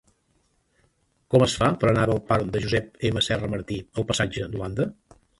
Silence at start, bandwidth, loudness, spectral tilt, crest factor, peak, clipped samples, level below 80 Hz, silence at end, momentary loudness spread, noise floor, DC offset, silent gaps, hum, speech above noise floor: 1.3 s; 11.5 kHz; -24 LUFS; -5.5 dB/octave; 20 dB; -4 dBFS; under 0.1%; -46 dBFS; 0.45 s; 9 LU; -68 dBFS; under 0.1%; none; none; 44 dB